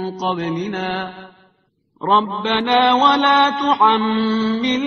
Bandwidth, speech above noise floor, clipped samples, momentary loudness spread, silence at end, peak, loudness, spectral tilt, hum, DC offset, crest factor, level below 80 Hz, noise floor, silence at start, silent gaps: 6.6 kHz; 45 dB; under 0.1%; 11 LU; 0 s; 0 dBFS; -16 LUFS; -2 dB/octave; none; under 0.1%; 16 dB; -58 dBFS; -62 dBFS; 0 s; none